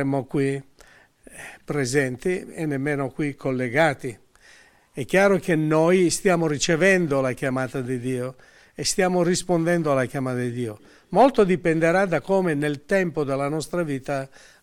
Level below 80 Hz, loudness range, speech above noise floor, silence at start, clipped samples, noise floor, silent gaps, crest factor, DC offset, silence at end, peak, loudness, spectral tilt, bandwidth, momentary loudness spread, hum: -52 dBFS; 5 LU; 31 dB; 0 s; under 0.1%; -53 dBFS; none; 16 dB; under 0.1%; 0.35 s; -6 dBFS; -22 LUFS; -5.5 dB/octave; 16 kHz; 11 LU; none